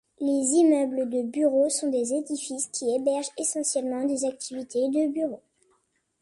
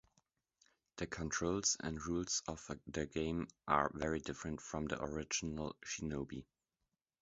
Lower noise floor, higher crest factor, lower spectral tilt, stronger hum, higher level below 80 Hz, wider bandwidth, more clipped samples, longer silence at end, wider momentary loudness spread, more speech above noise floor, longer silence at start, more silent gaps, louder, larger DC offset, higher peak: second, -71 dBFS vs -89 dBFS; second, 16 dB vs 26 dB; about the same, -3 dB/octave vs -4 dB/octave; neither; second, -74 dBFS vs -58 dBFS; first, 11.5 kHz vs 7.6 kHz; neither; about the same, 0.85 s vs 0.8 s; about the same, 9 LU vs 10 LU; second, 45 dB vs 49 dB; second, 0.2 s vs 0.95 s; neither; first, -26 LUFS vs -40 LUFS; neither; first, -10 dBFS vs -16 dBFS